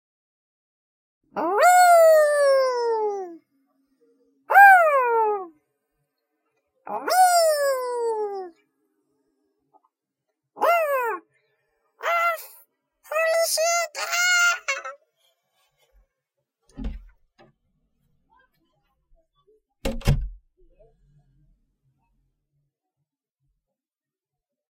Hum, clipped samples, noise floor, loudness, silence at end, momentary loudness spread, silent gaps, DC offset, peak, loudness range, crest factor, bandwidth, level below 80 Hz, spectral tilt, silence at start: none; under 0.1%; under -90 dBFS; -19 LUFS; 4.4 s; 22 LU; none; under 0.1%; -2 dBFS; 15 LU; 22 dB; 16.5 kHz; -42 dBFS; -2.5 dB/octave; 1.35 s